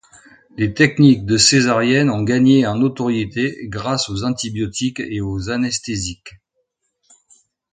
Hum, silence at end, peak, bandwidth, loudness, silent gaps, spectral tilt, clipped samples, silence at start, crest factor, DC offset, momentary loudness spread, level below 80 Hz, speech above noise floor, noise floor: none; 1.45 s; 0 dBFS; 9.6 kHz; -17 LUFS; none; -4.5 dB/octave; under 0.1%; 0.55 s; 18 dB; under 0.1%; 12 LU; -44 dBFS; 54 dB; -71 dBFS